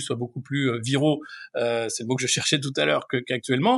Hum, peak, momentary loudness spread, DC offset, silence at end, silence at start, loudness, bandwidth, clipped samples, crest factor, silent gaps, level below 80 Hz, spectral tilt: none; -6 dBFS; 8 LU; under 0.1%; 0 s; 0 s; -25 LUFS; 12 kHz; under 0.1%; 18 dB; none; -76 dBFS; -4 dB/octave